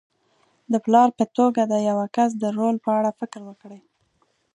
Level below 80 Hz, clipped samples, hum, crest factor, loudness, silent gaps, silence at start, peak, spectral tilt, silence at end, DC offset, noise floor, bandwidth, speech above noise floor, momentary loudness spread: -74 dBFS; under 0.1%; none; 20 dB; -21 LUFS; none; 0.7 s; -2 dBFS; -6.5 dB/octave; 0.8 s; under 0.1%; -67 dBFS; 10.5 kHz; 46 dB; 17 LU